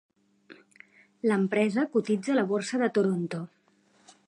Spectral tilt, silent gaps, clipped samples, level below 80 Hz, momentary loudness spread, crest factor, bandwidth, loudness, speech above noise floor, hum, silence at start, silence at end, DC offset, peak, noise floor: -6.5 dB/octave; none; under 0.1%; -80 dBFS; 8 LU; 18 dB; 11 kHz; -27 LUFS; 38 dB; none; 0.5 s; 0.8 s; under 0.1%; -12 dBFS; -65 dBFS